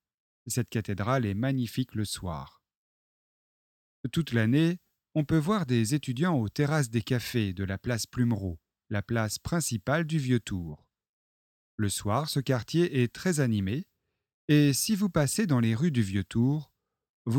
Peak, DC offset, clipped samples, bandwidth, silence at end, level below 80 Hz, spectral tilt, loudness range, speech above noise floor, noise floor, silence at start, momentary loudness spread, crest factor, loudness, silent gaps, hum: -12 dBFS; under 0.1%; under 0.1%; 17.5 kHz; 0 s; -56 dBFS; -5.5 dB/octave; 5 LU; over 62 dB; under -90 dBFS; 0.45 s; 10 LU; 18 dB; -29 LUFS; 2.76-4.04 s, 11.09-11.78 s, 14.34-14.48 s, 17.09-17.25 s; none